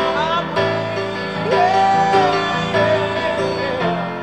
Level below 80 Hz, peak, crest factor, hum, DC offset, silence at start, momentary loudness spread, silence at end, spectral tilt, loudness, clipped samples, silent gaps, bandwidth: -48 dBFS; -4 dBFS; 14 dB; none; 0.3%; 0 s; 7 LU; 0 s; -5.5 dB/octave; -17 LUFS; under 0.1%; none; 11 kHz